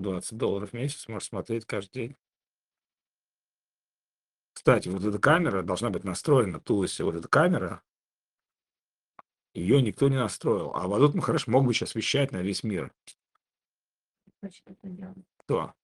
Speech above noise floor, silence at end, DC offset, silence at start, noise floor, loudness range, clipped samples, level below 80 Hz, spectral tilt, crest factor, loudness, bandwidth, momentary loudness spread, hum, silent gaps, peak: over 63 dB; 0.15 s; under 0.1%; 0 s; under -90 dBFS; 12 LU; under 0.1%; -62 dBFS; -5.5 dB/octave; 24 dB; -27 LUFS; 12.5 kHz; 19 LU; 50 Hz at -60 dBFS; 7.90-8.03 s; -4 dBFS